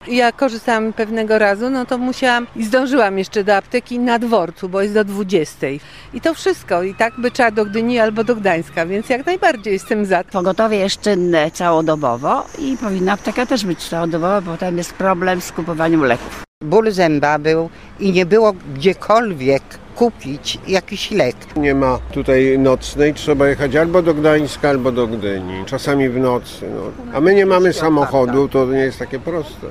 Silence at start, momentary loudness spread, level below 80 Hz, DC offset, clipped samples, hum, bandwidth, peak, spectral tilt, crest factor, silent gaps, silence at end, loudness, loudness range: 0 s; 8 LU; -40 dBFS; 0.5%; under 0.1%; none; 14.5 kHz; -2 dBFS; -5.5 dB/octave; 14 dB; 16.48-16.61 s; 0 s; -16 LUFS; 3 LU